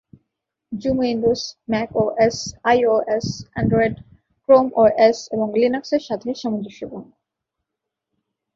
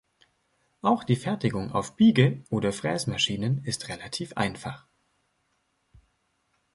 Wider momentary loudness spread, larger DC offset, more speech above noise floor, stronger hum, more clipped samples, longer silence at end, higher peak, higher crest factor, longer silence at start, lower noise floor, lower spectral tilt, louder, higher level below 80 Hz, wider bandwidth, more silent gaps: first, 15 LU vs 12 LU; neither; first, 63 dB vs 47 dB; neither; neither; second, 1.5 s vs 1.95 s; first, -2 dBFS vs -6 dBFS; about the same, 18 dB vs 22 dB; second, 0.7 s vs 0.85 s; first, -82 dBFS vs -73 dBFS; about the same, -5.5 dB/octave vs -5.5 dB/octave; first, -19 LUFS vs -26 LUFS; first, -50 dBFS vs -58 dBFS; second, 7.8 kHz vs 11.5 kHz; neither